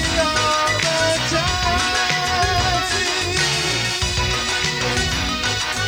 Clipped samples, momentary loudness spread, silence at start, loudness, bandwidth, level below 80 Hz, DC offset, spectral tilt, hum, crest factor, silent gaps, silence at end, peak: under 0.1%; 2 LU; 0 s; -18 LUFS; over 20 kHz; -32 dBFS; under 0.1%; -2.5 dB/octave; none; 16 dB; none; 0 s; -4 dBFS